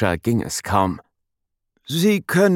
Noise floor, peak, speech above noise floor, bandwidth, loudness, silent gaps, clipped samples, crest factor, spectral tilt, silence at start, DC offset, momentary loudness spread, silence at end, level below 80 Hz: -77 dBFS; -2 dBFS; 58 dB; 17 kHz; -20 LUFS; none; under 0.1%; 18 dB; -5.5 dB/octave; 0 s; under 0.1%; 8 LU; 0 s; -52 dBFS